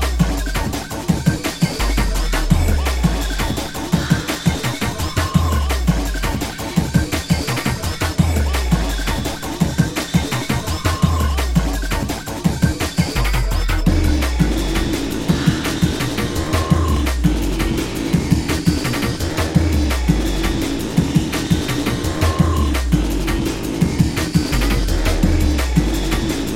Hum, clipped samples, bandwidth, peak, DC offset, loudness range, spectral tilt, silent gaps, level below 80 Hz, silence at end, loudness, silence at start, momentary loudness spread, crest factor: none; under 0.1%; 16.5 kHz; 0 dBFS; under 0.1%; 1 LU; -5.5 dB/octave; none; -22 dBFS; 0 s; -19 LUFS; 0 s; 4 LU; 16 dB